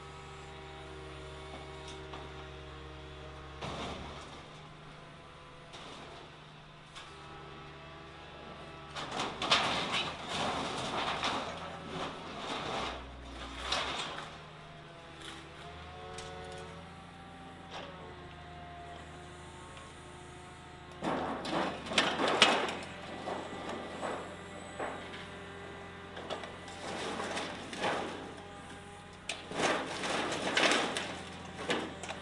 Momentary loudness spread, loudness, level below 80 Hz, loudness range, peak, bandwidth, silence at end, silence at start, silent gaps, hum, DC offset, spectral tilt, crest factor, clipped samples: 18 LU; -36 LUFS; -58 dBFS; 16 LU; -8 dBFS; 11.5 kHz; 0 s; 0 s; none; none; under 0.1%; -3 dB/octave; 30 dB; under 0.1%